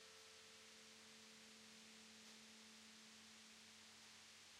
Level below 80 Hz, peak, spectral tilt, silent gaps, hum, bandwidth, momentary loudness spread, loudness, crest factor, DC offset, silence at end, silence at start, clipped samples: under -90 dBFS; -50 dBFS; -1 dB/octave; none; none; 15.5 kHz; 1 LU; -61 LUFS; 14 dB; under 0.1%; 0 s; 0 s; under 0.1%